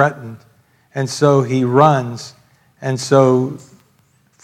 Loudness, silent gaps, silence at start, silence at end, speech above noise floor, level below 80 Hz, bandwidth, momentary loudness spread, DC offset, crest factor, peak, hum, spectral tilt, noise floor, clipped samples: -15 LUFS; none; 0 s; 0.85 s; 42 dB; -64 dBFS; 13.5 kHz; 21 LU; under 0.1%; 16 dB; 0 dBFS; none; -6.5 dB/octave; -57 dBFS; under 0.1%